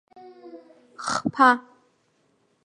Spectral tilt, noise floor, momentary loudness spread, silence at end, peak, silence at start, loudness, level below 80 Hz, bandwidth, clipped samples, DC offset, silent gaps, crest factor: -3.5 dB/octave; -67 dBFS; 26 LU; 1.05 s; -4 dBFS; 0.45 s; -22 LUFS; -68 dBFS; 11 kHz; under 0.1%; under 0.1%; none; 22 dB